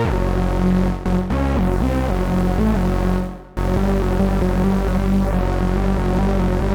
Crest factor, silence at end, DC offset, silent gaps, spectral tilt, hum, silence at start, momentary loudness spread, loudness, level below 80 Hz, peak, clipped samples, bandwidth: 10 dB; 0 s; under 0.1%; none; -8 dB/octave; none; 0 s; 2 LU; -19 LUFS; -22 dBFS; -6 dBFS; under 0.1%; 16.5 kHz